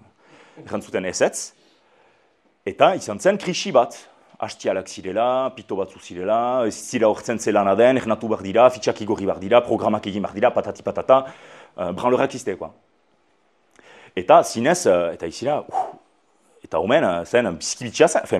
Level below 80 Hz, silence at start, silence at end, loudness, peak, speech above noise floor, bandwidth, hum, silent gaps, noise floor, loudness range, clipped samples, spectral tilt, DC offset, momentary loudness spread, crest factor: -62 dBFS; 0.55 s; 0 s; -21 LUFS; 0 dBFS; 43 dB; 13 kHz; none; none; -63 dBFS; 4 LU; under 0.1%; -4.5 dB/octave; under 0.1%; 14 LU; 22 dB